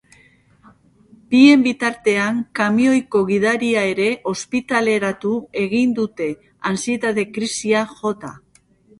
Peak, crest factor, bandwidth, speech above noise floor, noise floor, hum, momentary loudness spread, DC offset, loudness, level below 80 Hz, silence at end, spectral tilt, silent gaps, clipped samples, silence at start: 0 dBFS; 18 dB; 11.5 kHz; 36 dB; -54 dBFS; none; 10 LU; under 0.1%; -18 LUFS; -60 dBFS; 0.65 s; -4.5 dB/octave; none; under 0.1%; 1.3 s